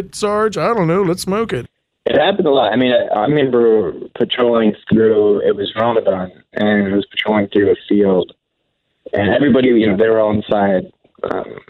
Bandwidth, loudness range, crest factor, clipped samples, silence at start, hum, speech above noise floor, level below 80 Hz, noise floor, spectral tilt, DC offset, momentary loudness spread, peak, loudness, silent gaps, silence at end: 13.5 kHz; 2 LU; 12 dB; under 0.1%; 0 s; none; 55 dB; -50 dBFS; -70 dBFS; -6 dB/octave; under 0.1%; 10 LU; -4 dBFS; -15 LUFS; none; 0.1 s